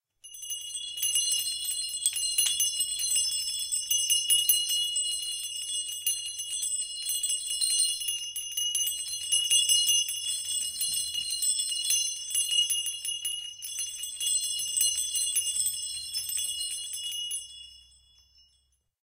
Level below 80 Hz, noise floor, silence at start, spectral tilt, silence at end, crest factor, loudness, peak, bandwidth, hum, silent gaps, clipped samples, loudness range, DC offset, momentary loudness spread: -70 dBFS; -71 dBFS; 0.25 s; 5 dB/octave; 1.2 s; 20 dB; -26 LUFS; -10 dBFS; 16.5 kHz; none; none; under 0.1%; 3 LU; under 0.1%; 10 LU